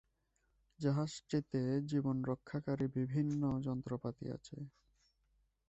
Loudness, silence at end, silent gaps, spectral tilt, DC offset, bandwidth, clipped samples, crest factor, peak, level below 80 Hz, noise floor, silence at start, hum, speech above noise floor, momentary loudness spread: -39 LUFS; 1 s; none; -7.5 dB/octave; under 0.1%; 8.2 kHz; under 0.1%; 18 dB; -22 dBFS; -66 dBFS; -80 dBFS; 0.8 s; none; 42 dB; 10 LU